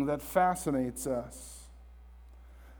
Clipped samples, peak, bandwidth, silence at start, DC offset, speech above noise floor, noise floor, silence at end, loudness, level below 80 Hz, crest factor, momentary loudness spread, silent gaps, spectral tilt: under 0.1%; -12 dBFS; over 20 kHz; 0 s; under 0.1%; 20 dB; -52 dBFS; 0 s; -31 LUFS; -52 dBFS; 22 dB; 19 LU; none; -5.5 dB/octave